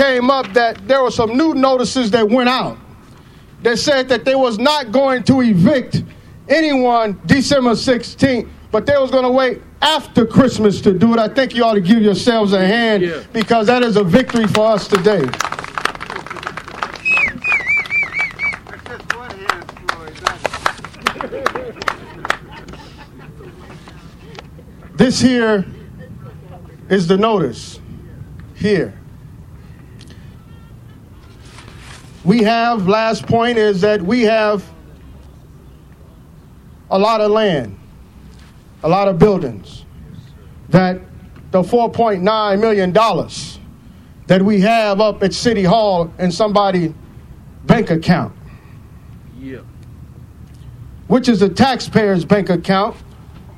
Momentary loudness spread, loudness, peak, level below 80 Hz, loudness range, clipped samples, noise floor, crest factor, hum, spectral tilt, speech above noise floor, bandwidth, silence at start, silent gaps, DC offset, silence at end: 19 LU; -15 LUFS; 0 dBFS; -42 dBFS; 9 LU; under 0.1%; -41 dBFS; 16 dB; none; -5.5 dB/octave; 27 dB; 14 kHz; 0 s; none; under 0.1%; 0.05 s